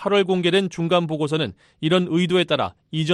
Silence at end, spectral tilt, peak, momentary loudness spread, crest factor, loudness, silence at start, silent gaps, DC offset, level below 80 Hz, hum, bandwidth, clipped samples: 0 s; -6 dB/octave; -6 dBFS; 8 LU; 14 dB; -21 LUFS; 0 s; none; under 0.1%; -60 dBFS; none; 11.5 kHz; under 0.1%